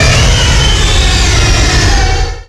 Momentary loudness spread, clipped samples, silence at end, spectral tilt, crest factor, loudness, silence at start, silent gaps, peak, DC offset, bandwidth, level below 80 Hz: 2 LU; under 0.1%; 0.05 s; -3.5 dB/octave; 8 dB; -9 LUFS; 0 s; none; 0 dBFS; under 0.1%; 12 kHz; -12 dBFS